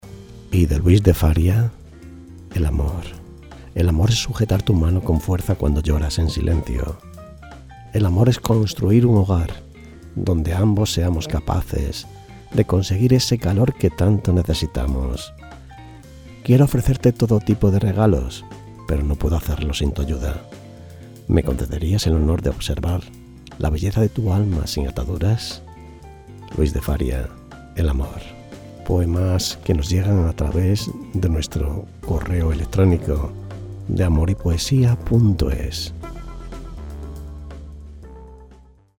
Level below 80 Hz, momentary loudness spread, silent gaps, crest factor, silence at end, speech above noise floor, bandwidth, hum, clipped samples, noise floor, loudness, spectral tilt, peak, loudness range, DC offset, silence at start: -28 dBFS; 23 LU; none; 20 dB; 0.45 s; 30 dB; 18 kHz; none; under 0.1%; -48 dBFS; -20 LUFS; -6.5 dB/octave; 0 dBFS; 5 LU; under 0.1%; 0.05 s